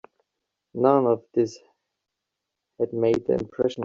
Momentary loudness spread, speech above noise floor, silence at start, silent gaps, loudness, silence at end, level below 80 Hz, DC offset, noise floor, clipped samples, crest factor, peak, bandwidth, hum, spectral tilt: 9 LU; 61 dB; 0.75 s; none; -24 LUFS; 0 s; -62 dBFS; under 0.1%; -83 dBFS; under 0.1%; 20 dB; -6 dBFS; 7.6 kHz; none; -7.5 dB/octave